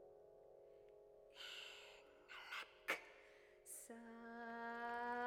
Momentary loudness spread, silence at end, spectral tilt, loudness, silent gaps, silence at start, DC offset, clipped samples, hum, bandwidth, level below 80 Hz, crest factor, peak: 19 LU; 0 s; -1.5 dB/octave; -51 LUFS; none; 0 s; under 0.1%; under 0.1%; none; 19.5 kHz; -84 dBFS; 24 dB; -28 dBFS